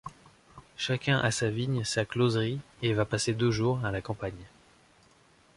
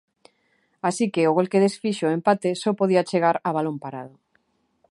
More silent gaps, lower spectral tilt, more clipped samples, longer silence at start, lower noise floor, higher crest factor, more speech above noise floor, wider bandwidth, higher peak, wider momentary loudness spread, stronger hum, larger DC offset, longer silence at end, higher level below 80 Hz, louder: neither; about the same, -5 dB/octave vs -6 dB/octave; neither; second, 0.05 s vs 0.85 s; second, -61 dBFS vs -68 dBFS; about the same, 20 dB vs 18 dB; second, 33 dB vs 46 dB; about the same, 11.5 kHz vs 11.5 kHz; second, -10 dBFS vs -4 dBFS; about the same, 10 LU vs 11 LU; neither; neither; first, 1.1 s vs 0.85 s; first, -56 dBFS vs -72 dBFS; second, -29 LUFS vs -22 LUFS